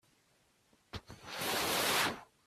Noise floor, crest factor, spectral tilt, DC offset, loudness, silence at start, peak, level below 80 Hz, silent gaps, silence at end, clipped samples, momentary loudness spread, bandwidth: -72 dBFS; 20 dB; -1.5 dB/octave; under 0.1%; -33 LUFS; 0.95 s; -18 dBFS; -66 dBFS; none; 0.25 s; under 0.1%; 19 LU; 16 kHz